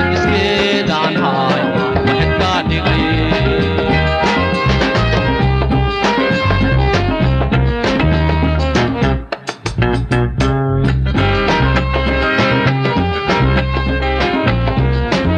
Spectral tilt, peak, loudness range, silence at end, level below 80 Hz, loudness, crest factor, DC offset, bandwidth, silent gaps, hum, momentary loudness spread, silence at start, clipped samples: -6.5 dB/octave; 0 dBFS; 2 LU; 0 s; -22 dBFS; -14 LUFS; 14 dB; under 0.1%; 9.2 kHz; none; none; 2 LU; 0 s; under 0.1%